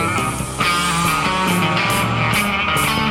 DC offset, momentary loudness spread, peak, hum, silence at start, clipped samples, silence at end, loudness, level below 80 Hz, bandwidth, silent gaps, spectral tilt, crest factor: under 0.1%; 3 LU; -4 dBFS; none; 0 s; under 0.1%; 0 s; -17 LUFS; -38 dBFS; 16.5 kHz; none; -3.5 dB/octave; 14 dB